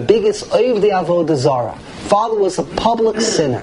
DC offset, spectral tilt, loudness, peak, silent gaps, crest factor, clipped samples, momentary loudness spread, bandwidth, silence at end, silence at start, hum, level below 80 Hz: under 0.1%; -5 dB/octave; -16 LUFS; 0 dBFS; none; 16 dB; under 0.1%; 4 LU; 11 kHz; 0 s; 0 s; none; -44 dBFS